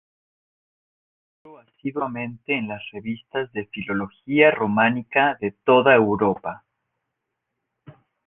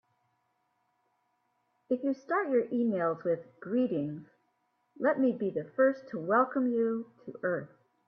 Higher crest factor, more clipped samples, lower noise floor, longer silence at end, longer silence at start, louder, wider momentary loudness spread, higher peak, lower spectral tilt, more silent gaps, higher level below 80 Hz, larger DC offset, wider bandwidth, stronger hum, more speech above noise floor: about the same, 22 dB vs 18 dB; neither; about the same, -80 dBFS vs -77 dBFS; first, 1.7 s vs 0.4 s; second, 1.45 s vs 1.9 s; first, -21 LUFS vs -31 LUFS; first, 15 LU vs 9 LU; first, -2 dBFS vs -14 dBFS; about the same, -9 dB/octave vs -9 dB/octave; neither; first, -60 dBFS vs -80 dBFS; neither; second, 3.9 kHz vs 6.2 kHz; neither; first, 59 dB vs 46 dB